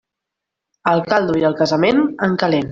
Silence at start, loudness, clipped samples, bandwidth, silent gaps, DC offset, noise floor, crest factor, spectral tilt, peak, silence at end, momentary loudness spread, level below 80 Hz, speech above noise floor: 0.85 s; -17 LUFS; under 0.1%; 7.6 kHz; none; under 0.1%; -82 dBFS; 16 dB; -6.5 dB/octave; 0 dBFS; 0.05 s; 4 LU; -54 dBFS; 66 dB